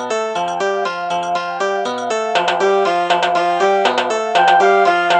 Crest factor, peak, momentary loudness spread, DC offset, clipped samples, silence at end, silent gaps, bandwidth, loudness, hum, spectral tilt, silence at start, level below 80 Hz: 14 dB; -2 dBFS; 8 LU; under 0.1%; under 0.1%; 0 s; none; 9.4 kHz; -16 LUFS; none; -3 dB/octave; 0 s; -68 dBFS